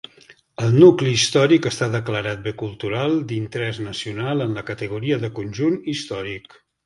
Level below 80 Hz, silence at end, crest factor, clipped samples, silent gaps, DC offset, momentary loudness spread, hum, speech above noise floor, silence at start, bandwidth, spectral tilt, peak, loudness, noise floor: -54 dBFS; 0.45 s; 20 dB; under 0.1%; none; under 0.1%; 16 LU; none; 31 dB; 0.3 s; 11.5 kHz; -5.5 dB/octave; 0 dBFS; -20 LUFS; -51 dBFS